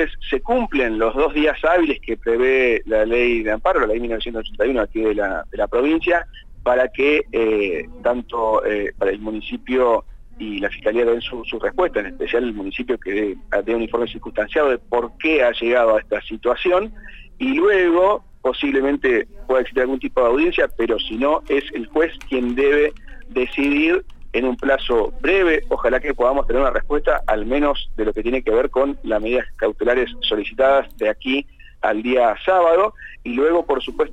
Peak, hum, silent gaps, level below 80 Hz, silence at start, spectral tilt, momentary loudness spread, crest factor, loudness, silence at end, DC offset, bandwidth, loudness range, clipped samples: -6 dBFS; none; none; -34 dBFS; 0 s; -6 dB/octave; 7 LU; 14 dB; -19 LUFS; 0 s; under 0.1%; 8.8 kHz; 3 LU; under 0.1%